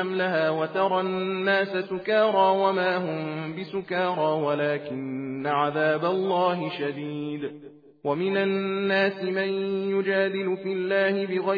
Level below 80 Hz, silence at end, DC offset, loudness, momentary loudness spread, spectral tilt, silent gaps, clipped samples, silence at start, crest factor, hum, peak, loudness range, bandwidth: -80 dBFS; 0 s; under 0.1%; -25 LUFS; 9 LU; -8 dB/octave; none; under 0.1%; 0 s; 16 dB; none; -8 dBFS; 3 LU; 5 kHz